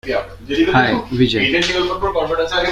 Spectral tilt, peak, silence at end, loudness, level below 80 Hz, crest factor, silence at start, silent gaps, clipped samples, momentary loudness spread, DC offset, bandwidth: -5 dB/octave; -2 dBFS; 0 s; -16 LUFS; -38 dBFS; 16 dB; 0.05 s; none; under 0.1%; 8 LU; under 0.1%; 14 kHz